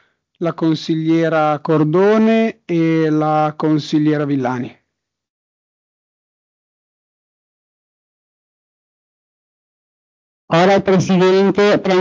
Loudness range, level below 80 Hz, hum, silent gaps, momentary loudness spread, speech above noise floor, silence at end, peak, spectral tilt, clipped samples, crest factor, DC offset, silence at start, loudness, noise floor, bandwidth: 9 LU; -60 dBFS; none; 5.30-10.48 s; 7 LU; 61 dB; 0 s; -2 dBFS; -7 dB/octave; under 0.1%; 16 dB; under 0.1%; 0.4 s; -15 LUFS; -75 dBFS; 7.6 kHz